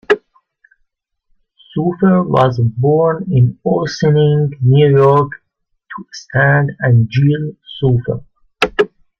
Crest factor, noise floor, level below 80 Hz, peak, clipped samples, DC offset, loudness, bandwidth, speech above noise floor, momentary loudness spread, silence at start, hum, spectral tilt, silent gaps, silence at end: 14 dB; -66 dBFS; -48 dBFS; 0 dBFS; under 0.1%; under 0.1%; -14 LUFS; 7 kHz; 53 dB; 14 LU; 0.1 s; none; -8 dB/octave; none; 0.35 s